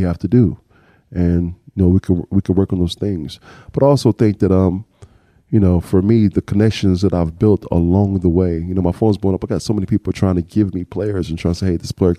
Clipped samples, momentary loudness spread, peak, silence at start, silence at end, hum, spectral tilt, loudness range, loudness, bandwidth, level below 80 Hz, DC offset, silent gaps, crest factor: under 0.1%; 7 LU; -2 dBFS; 0 s; 0 s; none; -8.5 dB/octave; 3 LU; -17 LUFS; 12 kHz; -36 dBFS; under 0.1%; none; 14 dB